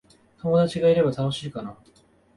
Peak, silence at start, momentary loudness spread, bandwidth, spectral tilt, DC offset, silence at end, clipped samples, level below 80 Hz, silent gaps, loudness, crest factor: -10 dBFS; 0.45 s; 16 LU; 11.5 kHz; -7 dB/octave; under 0.1%; 0.65 s; under 0.1%; -56 dBFS; none; -23 LUFS; 16 dB